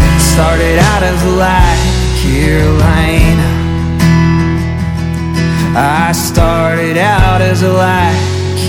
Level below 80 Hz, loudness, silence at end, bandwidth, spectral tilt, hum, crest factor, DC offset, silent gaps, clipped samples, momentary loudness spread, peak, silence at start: -16 dBFS; -10 LUFS; 0 s; 17 kHz; -5.5 dB/octave; none; 10 dB; under 0.1%; none; 0.4%; 5 LU; 0 dBFS; 0 s